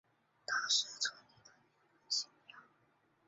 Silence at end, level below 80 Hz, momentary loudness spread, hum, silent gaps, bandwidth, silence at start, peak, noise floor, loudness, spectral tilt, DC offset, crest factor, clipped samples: 0.65 s; under -90 dBFS; 13 LU; none; none; 8 kHz; 0.5 s; -20 dBFS; -74 dBFS; -36 LUFS; 5 dB/octave; under 0.1%; 22 dB; under 0.1%